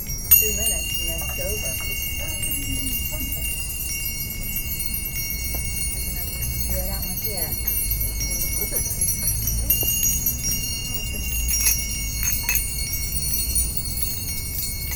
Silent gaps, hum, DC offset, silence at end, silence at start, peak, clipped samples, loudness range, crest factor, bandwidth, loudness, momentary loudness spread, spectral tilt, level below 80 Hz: none; none; under 0.1%; 0 s; 0 s; -2 dBFS; under 0.1%; 4 LU; 22 dB; over 20 kHz; -22 LUFS; 7 LU; -2 dB/octave; -30 dBFS